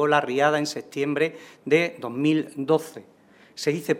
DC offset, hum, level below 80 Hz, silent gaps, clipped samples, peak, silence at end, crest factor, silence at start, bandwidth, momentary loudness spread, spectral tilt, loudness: under 0.1%; none; -74 dBFS; none; under 0.1%; -6 dBFS; 0 s; 18 dB; 0 s; 16.5 kHz; 8 LU; -5 dB/octave; -24 LUFS